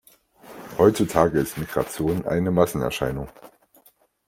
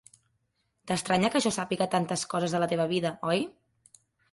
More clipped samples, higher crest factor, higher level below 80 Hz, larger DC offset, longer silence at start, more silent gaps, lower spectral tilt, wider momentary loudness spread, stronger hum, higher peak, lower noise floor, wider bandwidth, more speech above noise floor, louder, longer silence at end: neither; about the same, 22 dB vs 18 dB; first, -48 dBFS vs -66 dBFS; neither; second, 0.45 s vs 0.85 s; neither; first, -6 dB/octave vs -4.5 dB/octave; first, 15 LU vs 5 LU; neither; first, -2 dBFS vs -12 dBFS; second, -59 dBFS vs -76 dBFS; first, 16.5 kHz vs 11.5 kHz; second, 36 dB vs 48 dB; first, -22 LUFS vs -28 LUFS; about the same, 0.8 s vs 0.85 s